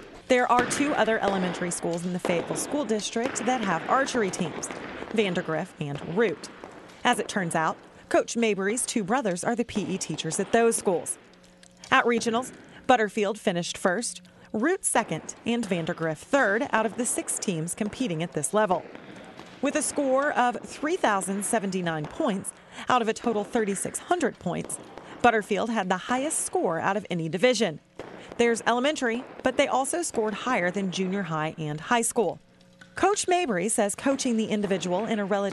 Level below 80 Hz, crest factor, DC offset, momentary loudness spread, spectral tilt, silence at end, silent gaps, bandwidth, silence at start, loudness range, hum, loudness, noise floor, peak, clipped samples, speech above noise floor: -62 dBFS; 22 dB; under 0.1%; 10 LU; -4 dB/octave; 0 s; none; 12 kHz; 0 s; 2 LU; none; -26 LUFS; -53 dBFS; -4 dBFS; under 0.1%; 27 dB